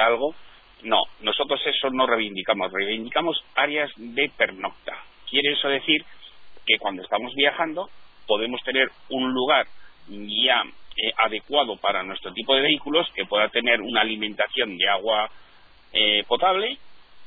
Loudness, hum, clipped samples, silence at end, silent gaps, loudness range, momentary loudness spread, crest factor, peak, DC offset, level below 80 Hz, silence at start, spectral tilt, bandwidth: -22 LUFS; none; under 0.1%; 0 s; none; 2 LU; 10 LU; 20 dB; -4 dBFS; under 0.1%; -60 dBFS; 0 s; -6 dB/octave; 4.9 kHz